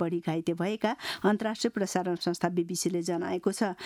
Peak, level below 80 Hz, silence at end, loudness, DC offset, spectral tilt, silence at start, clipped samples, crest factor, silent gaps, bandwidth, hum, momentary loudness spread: -12 dBFS; -70 dBFS; 0 s; -30 LUFS; under 0.1%; -5 dB/octave; 0 s; under 0.1%; 18 dB; none; 15 kHz; none; 3 LU